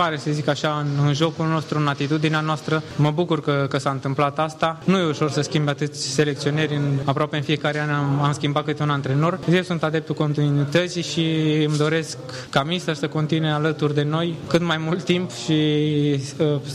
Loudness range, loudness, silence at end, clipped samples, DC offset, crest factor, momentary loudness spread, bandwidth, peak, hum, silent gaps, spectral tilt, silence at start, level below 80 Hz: 1 LU; -22 LUFS; 0 s; under 0.1%; under 0.1%; 16 dB; 4 LU; 11.5 kHz; -6 dBFS; none; none; -6 dB/octave; 0 s; -60 dBFS